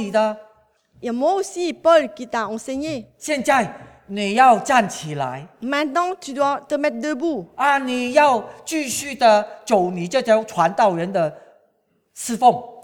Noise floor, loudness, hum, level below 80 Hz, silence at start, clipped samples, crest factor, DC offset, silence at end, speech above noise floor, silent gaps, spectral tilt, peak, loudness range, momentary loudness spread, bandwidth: -65 dBFS; -20 LUFS; none; -62 dBFS; 0 s; under 0.1%; 18 dB; under 0.1%; 0 s; 46 dB; none; -4 dB/octave; -2 dBFS; 3 LU; 11 LU; 18.5 kHz